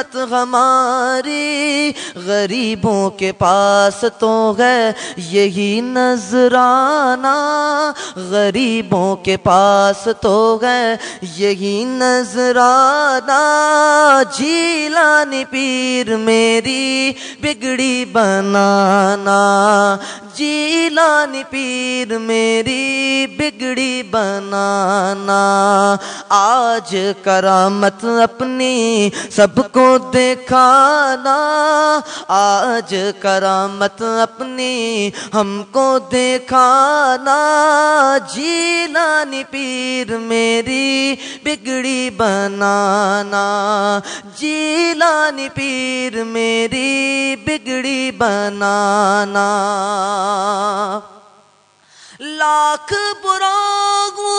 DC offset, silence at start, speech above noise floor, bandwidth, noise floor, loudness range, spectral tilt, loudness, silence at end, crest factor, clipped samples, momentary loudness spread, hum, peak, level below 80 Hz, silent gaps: under 0.1%; 0 s; 37 dB; 10.5 kHz; -52 dBFS; 5 LU; -3.5 dB/octave; -14 LUFS; 0 s; 14 dB; under 0.1%; 8 LU; none; 0 dBFS; -54 dBFS; none